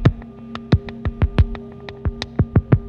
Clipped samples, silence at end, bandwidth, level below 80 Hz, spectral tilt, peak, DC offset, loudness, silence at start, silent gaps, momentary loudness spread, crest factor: under 0.1%; 0 s; 7 kHz; -26 dBFS; -8.5 dB/octave; -2 dBFS; under 0.1%; -21 LUFS; 0 s; none; 15 LU; 18 dB